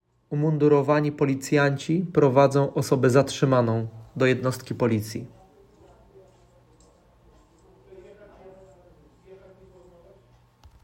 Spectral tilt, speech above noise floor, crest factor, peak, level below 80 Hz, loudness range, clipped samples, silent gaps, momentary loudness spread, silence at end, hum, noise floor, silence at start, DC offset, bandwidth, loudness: -6.5 dB/octave; 36 dB; 22 dB; -4 dBFS; -60 dBFS; 12 LU; under 0.1%; none; 10 LU; 1.5 s; none; -57 dBFS; 0.3 s; under 0.1%; 16 kHz; -23 LUFS